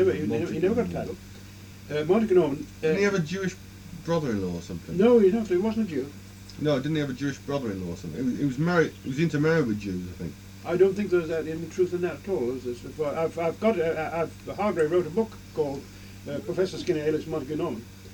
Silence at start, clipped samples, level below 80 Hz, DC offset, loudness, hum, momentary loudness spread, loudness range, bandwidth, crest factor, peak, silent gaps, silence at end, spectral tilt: 0 s; under 0.1%; -52 dBFS; under 0.1%; -27 LUFS; none; 15 LU; 3 LU; 19 kHz; 18 dB; -8 dBFS; none; 0 s; -7 dB/octave